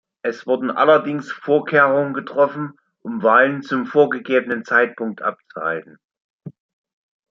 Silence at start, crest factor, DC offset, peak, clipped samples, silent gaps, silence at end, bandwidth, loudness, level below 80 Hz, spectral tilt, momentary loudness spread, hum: 0.25 s; 18 dB; under 0.1%; 0 dBFS; under 0.1%; 6.05-6.09 s, 6.24-6.39 s; 0.8 s; 7.4 kHz; -18 LUFS; -72 dBFS; -7 dB/octave; 12 LU; none